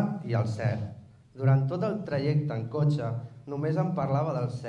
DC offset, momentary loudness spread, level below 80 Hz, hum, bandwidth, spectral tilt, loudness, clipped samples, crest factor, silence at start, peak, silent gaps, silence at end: under 0.1%; 9 LU; -66 dBFS; none; 8.4 kHz; -9 dB/octave; -29 LUFS; under 0.1%; 16 dB; 0 s; -12 dBFS; none; 0 s